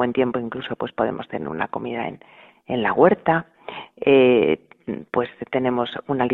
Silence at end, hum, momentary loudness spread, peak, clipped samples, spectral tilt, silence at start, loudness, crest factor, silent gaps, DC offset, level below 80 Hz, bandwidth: 0 s; none; 14 LU; -2 dBFS; under 0.1%; -9 dB/octave; 0 s; -22 LUFS; 20 dB; none; under 0.1%; -58 dBFS; 4.1 kHz